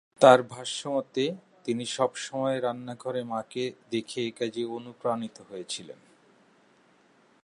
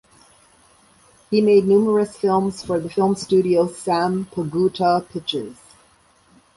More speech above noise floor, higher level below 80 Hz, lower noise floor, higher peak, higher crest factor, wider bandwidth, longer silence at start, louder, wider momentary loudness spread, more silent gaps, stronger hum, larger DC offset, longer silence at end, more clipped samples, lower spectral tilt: about the same, 35 dB vs 37 dB; second, -80 dBFS vs -58 dBFS; first, -62 dBFS vs -56 dBFS; about the same, -4 dBFS vs -4 dBFS; first, 26 dB vs 16 dB; about the same, 11.5 kHz vs 11.5 kHz; second, 0.2 s vs 1.3 s; second, -28 LUFS vs -19 LUFS; first, 14 LU vs 10 LU; neither; neither; neither; first, 1.5 s vs 1.05 s; neither; second, -4.5 dB/octave vs -6.5 dB/octave